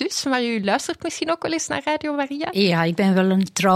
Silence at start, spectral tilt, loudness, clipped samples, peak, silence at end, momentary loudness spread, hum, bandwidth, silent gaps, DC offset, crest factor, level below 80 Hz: 0 s; -4.5 dB/octave; -21 LUFS; under 0.1%; -4 dBFS; 0 s; 6 LU; none; 15.5 kHz; none; under 0.1%; 16 dB; -62 dBFS